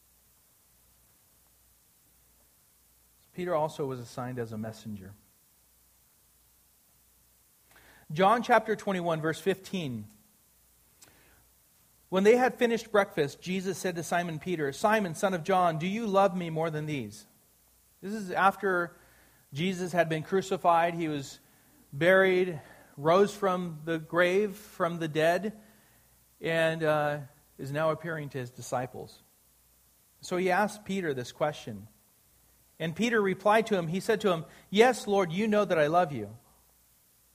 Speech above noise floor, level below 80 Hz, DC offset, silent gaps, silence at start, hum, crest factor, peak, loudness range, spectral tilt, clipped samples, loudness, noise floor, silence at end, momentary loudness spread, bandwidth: 36 dB; -68 dBFS; under 0.1%; none; 3.35 s; none; 22 dB; -8 dBFS; 10 LU; -5.5 dB/octave; under 0.1%; -29 LUFS; -64 dBFS; 0.95 s; 15 LU; 15.5 kHz